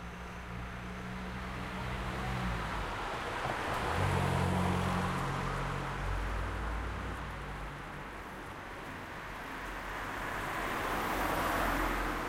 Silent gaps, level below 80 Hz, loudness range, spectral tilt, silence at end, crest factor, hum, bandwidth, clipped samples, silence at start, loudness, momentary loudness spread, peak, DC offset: none; -44 dBFS; 8 LU; -5.5 dB/octave; 0 s; 16 dB; none; 16 kHz; under 0.1%; 0 s; -36 LUFS; 12 LU; -20 dBFS; under 0.1%